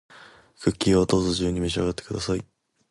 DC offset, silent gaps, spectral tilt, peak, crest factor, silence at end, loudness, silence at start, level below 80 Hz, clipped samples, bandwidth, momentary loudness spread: under 0.1%; none; -5.5 dB/octave; -6 dBFS; 18 dB; 0.45 s; -24 LUFS; 0.15 s; -42 dBFS; under 0.1%; 11.5 kHz; 9 LU